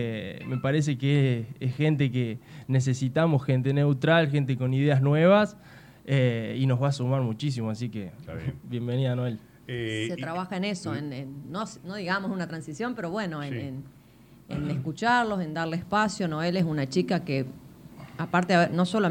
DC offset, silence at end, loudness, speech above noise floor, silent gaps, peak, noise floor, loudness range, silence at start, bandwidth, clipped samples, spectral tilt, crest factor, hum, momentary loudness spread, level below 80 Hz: under 0.1%; 0 s; -27 LUFS; 27 dB; none; -8 dBFS; -53 dBFS; 8 LU; 0 s; 10 kHz; under 0.1%; -7 dB/octave; 18 dB; none; 13 LU; -60 dBFS